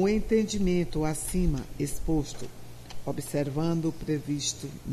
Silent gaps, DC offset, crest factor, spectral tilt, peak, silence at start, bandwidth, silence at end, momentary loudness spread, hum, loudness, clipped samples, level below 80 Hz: none; under 0.1%; 16 dB; -5.5 dB/octave; -14 dBFS; 0 s; 14 kHz; 0 s; 13 LU; none; -29 LUFS; under 0.1%; -40 dBFS